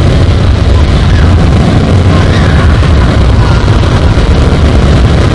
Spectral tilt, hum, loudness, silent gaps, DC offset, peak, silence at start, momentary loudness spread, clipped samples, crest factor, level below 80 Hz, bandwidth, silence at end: -7 dB/octave; none; -7 LUFS; none; under 0.1%; 0 dBFS; 0 s; 1 LU; 3%; 4 dB; -10 dBFS; 11 kHz; 0 s